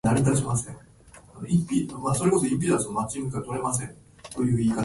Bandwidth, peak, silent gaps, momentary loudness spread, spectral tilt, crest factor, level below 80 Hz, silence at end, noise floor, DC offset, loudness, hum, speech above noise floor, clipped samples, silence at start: 11.5 kHz; -8 dBFS; none; 17 LU; -6 dB/octave; 18 dB; -50 dBFS; 0 s; -49 dBFS; under 0.1%; -26 LUFS; none; 24 dB; under 0.1%; 0.05 s